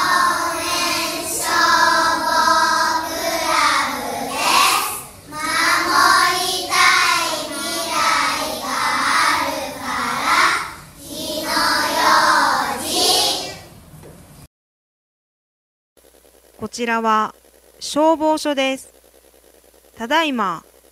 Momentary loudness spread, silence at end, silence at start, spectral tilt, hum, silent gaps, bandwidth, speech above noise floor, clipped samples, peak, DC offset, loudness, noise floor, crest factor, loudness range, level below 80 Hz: 12 LU; 0.3 s; 0 s; -1 dB/octave; none; 14.47-15.96 s; 16 kHz; 32 dB; under 0.1%; 0 dBFS; under 0.1%; -17 LUFS; -50 dBFS; 18 dB; 7 LU; -54 dBFS